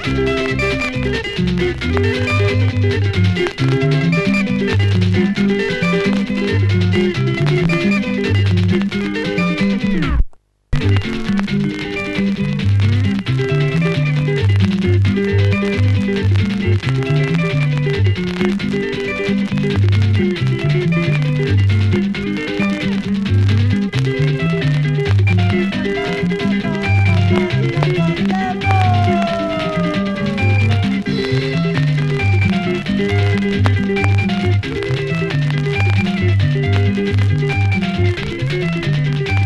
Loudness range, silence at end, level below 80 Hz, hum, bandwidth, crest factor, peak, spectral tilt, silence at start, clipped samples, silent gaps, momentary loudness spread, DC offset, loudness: 2 LU; 0 s; -30 dBFS; none; 10 kHz; 16 dB; 0 dBFS; -7.5 dB/octave; 0 s; under 0.1%; none; 4 LU; under 0.1%; -16 LUFS